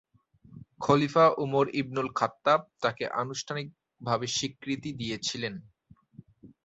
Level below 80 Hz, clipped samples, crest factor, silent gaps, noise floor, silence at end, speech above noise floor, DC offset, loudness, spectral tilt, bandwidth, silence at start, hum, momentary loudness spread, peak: -64 dBFS; under 0.1%; 20 dB; none; -59 dBFS; 0.2 s; 31 dB; under 0.1%; -28 LUFS; -4.5 dB/octave; 8.2 kHz; 0.5 s; none; 13 LU; -10 dBFS